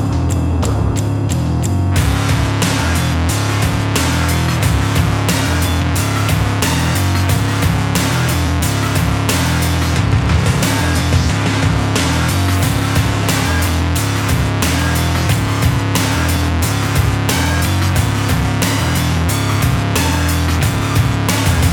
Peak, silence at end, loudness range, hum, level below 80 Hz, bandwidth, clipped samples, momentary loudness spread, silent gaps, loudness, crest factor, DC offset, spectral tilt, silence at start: -2 dBFS; 0 s; 1 LU; none; -24 dBFS; 19 kHz; under 0.1%; 1 LU; none; -15 LUFS; 12 dB; under 0.1%; -5 dB/octave; 0 s